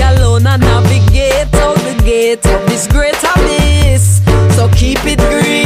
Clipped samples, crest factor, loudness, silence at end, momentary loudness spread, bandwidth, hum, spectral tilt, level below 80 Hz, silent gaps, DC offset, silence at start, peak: under 0.1%; 8 dB; -10 LUFS; 0 s; 3 LU; 16 kHz; none; -5 dB/octave; -14 dBFS; none; under 0.1%; 0 s; 0 dBFS